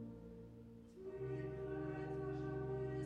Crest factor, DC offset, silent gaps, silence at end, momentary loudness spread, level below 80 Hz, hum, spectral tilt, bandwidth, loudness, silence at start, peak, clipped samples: 12 dB; under 0.1%; none; 0 s; 13 LU; -62 dBFS; none; -9 dB/octave; 7.8 kHz; -46 LUFS; 0 s; -34 dBFS; under 0.1%